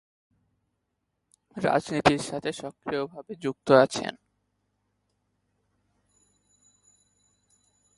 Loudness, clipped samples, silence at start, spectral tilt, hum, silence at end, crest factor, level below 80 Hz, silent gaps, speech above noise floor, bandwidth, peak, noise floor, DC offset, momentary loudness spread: -26 LUFS; under 0.1%; 1.55 s; -5 dB/octave; 50 Hz at -60 dBFS; 3.85 s; 26 dB; -60 dBFS; none; 54 dB; 11.5 kHz; -4 dBFS; -79 dBFS; under 0.1%; 16 LU